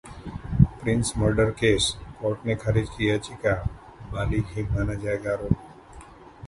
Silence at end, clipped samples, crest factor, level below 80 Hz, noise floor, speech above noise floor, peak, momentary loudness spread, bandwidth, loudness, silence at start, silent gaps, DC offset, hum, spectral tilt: 0 s; under 0.1%; 24 dB; -38 dBFS; -46 dBFS; 21 dB; -2 dBFS; 10 LU; 11.5 kHz; -25 LUFS; 0.05 s; none; under 0.1%; none; -5.5 dB/octave